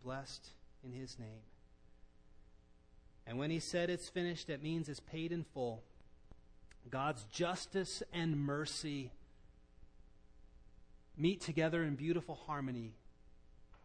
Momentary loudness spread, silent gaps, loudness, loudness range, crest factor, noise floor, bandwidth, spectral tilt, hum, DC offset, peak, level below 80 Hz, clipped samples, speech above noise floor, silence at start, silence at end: 16 LU; none; -41 LUFS; 4 LU; 20 dB; -64 dBFS; 10.5 kHz; -5.5 dB/octave; none; under 0.1%; -24 dBFS; -64 dBFS; under 0.1%; 24 dB; 0 s; 0.1 s